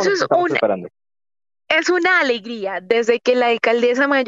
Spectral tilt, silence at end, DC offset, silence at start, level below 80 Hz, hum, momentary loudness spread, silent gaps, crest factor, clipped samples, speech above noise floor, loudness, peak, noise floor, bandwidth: -3.5 dB/octave; 0 s; under 0.1%; 0 s; -72 dBFS; none; 8 LU; none; 14 dB; under 0.1%; over 73 dB; -17 LUFS; -2 dBFS; under -90 dBFS; 7.8 kHz